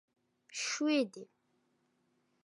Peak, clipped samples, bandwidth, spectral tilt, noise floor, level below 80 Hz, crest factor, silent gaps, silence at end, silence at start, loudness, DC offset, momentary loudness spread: -20 dBFS; under 0.1%; 11.5 kHz; -2 dB/octave; -77 dBFS; under -90 dBFS; 18 dB; none; 1.2 s; 0.5 s; -34 LUFS; under 0.1%; 15 LU